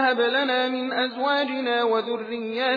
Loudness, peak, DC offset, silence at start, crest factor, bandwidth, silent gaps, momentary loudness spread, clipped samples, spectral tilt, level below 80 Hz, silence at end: -24 LUFS; -10 dBFS; under 0.1%; 0 s; 14 dB; 5 kHz; none; 7 LU; under 0.1%; -5 dB/octave; under -90 dBFS; 0 s